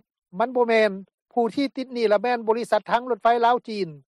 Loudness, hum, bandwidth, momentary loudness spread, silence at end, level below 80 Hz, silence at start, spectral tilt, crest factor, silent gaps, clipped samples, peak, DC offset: -23 LUFS; none; 12 kHz; 9 LU; 0.1 s; -70 dBFS; 0.35 s; -5.5 dB/octave; 14 dB; 1.14-1.26 s; under 0.1%; -8 dBFS; under 0.1%